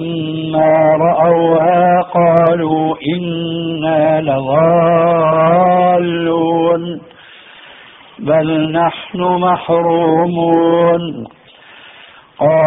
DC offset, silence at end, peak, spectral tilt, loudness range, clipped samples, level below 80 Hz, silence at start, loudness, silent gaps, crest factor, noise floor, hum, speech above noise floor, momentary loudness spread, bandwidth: under 0.1%; 0 s; 0 dBFS; -5.5 dB/octave; 4 LU; under 0.1%; -52 dBFS; 0 s; -13 LUFS; none; 12 dB; -41 dBFS; none; 29 dB; 8 LU; 4 kHz